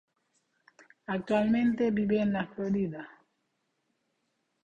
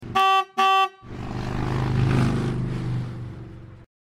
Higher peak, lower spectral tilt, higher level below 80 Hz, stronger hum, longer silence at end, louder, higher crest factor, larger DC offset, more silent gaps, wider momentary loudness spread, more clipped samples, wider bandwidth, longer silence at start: second, -12 dBFS vs -8 dBFS; first, -8 dB/octave vs -6 dB/octave; second, -64 dBFS vs -40 dBFS; neither; first, 1.6 s vs 0.2 s; second, -29 LUFS vs -23 LUFS; about the same, 18 dB vs 16 dB; neither; neither; about the same, 16 LU vs 18 LU; neither; second, 7.6 kHz vs 14 kHz; first, 1.1 s vs 0 s